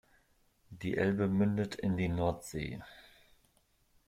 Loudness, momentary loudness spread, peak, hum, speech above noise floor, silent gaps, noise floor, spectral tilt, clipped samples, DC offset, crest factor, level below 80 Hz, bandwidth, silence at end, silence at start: -34 LUFS; 12 LU; -18 dBFS; none; 39 dB; none; -72 dBFS; -7 dB/octave; under 0.1%; under 0.1%; 18 dB; -58 dBFS; 15 kHz; 1.05 s; 0.7 s